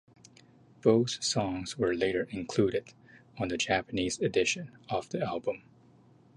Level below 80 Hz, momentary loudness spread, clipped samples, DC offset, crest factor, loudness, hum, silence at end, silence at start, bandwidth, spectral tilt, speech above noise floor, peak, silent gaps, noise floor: -60 dBFS; 9 LU; under 0.1%; under 0.1%; 22 dB; -30 LUFS; none; 0.8 s; 0.85 s; 11.5 kHz; -4.5 dB/octave; 30 dB; -10 dBFS; none; -60 dBFS